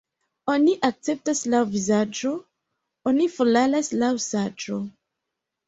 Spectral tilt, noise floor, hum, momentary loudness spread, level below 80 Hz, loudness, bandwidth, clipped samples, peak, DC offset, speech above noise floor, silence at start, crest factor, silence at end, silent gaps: -4.5 dB/octave; -83 dBFS; none; 11 LU; -66 dBFS; -23 LUFS; 8.2 kHz; under 0.1%; -4 dBFS; under 0.1%; 61 dB; 0.45 s; 20 dB; 0.75 s; none